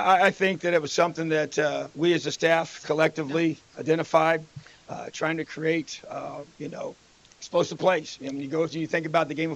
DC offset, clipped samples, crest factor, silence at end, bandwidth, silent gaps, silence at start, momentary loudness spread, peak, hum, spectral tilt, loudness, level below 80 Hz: under 0.1%; under 0.1%; 20 dB; 0 s; 11 kHz; none; 0 s; 15 LU; -6 dBFS; none; -5 dB/octave; -26 LUFS; -68 dBFS